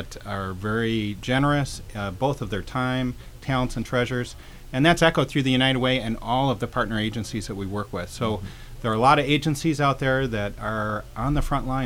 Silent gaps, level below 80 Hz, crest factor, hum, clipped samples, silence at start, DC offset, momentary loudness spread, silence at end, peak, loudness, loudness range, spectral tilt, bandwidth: none; -38 dBFS; 20 dB; none; under 0.1%; 0 s; under 0.1%; 11 LU; 0 s; -4 dBFS; -24 LUFS; 4 LU; -5.5 dB/octave; 16.5 kHz